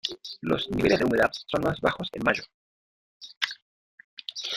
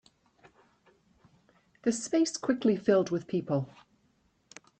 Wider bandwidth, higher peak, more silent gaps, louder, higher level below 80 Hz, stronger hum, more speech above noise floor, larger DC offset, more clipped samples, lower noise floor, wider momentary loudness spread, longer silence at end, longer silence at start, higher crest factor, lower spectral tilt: first, 16 kHz vs 9.2 kHz; first, -6 dBFS vs -12 dBFS; first, 2.54-3.20 s, 3.37-3.41 s, 3.62-3.98 s, 4.04-4.17 s vs none; about the same, -27 LUFS vs -29 LUFS; first, -54 dBFS vs -72 dBFS; neither; first, over 64 dB vs 42 dB; neither; neither; first, under -90 dBFS vs -70 dBFS; first, 22 LU vs 7 LU; second, 0 s vs 1.15 s; second, 0.05 s vs 1.85 s; about the same, 22 dB vs 20 dB; about the same, -5 dB/octave vs -5.5 dB/octave